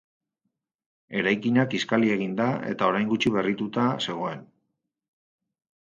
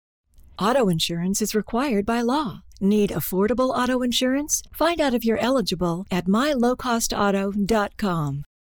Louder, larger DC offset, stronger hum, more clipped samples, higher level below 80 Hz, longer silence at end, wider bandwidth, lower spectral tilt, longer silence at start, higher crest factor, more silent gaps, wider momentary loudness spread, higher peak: second, -25 LUFS vs -22 LUFS; neither; neither; neither; second, -66 dBFS vs -46 dBFS; first, 1.5 s vs 0.2 s; second, 7.6 kHz vs over 20 kHz; first, -6 dB/octave vs -4.5 dB/octave; first, 1.1 s vs 0.6 s; first, 22 dB vs 10 dB; neither; first, 8 LU vs 4 LU; first, -6 dBFS vs -12 dBFS